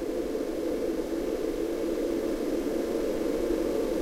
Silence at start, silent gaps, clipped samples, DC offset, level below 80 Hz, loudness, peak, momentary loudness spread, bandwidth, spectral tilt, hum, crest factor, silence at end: 0 s; none; under 0.1%; under 0.1%; -46 dBFS; -30 LUFS; -16 dBFS; 3 LU; 16 kHz; -5.5 dB/octave; none; 12 dB; 0 s